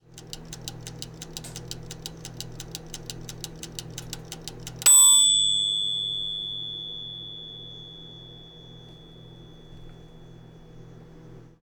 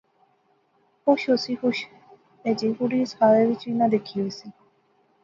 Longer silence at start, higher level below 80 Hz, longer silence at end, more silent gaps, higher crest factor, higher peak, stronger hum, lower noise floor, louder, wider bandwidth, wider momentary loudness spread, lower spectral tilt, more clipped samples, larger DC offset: second, 0.15 s vs 1.05 s; first, -52 dBFS vs -72 dBFS; second, 0.25 s vs 0.7 s; neither; about the same, 20 dB vs 20 dB; second, -10 dBFS vs -6 dBFS; neither; second, -47 dBFS vs -65 dBFS; first, -19 LUFS vs -23 LUFS; first, 19.5 kHz vs 7.4 kHz; first, 25 LU vs 13 LU; second, 0 dB/octave vs -6 dB/octave; neither; neither